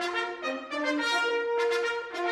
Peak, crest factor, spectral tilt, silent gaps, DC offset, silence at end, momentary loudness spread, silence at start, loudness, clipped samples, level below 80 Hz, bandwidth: -14 dBFS; 14 dB; -1.5 dB/octave; none; under 0.1%; 0 s; 6 LU; 0 s; -29 LUFS; under 0.1%; -74 dBFS; 14 kHz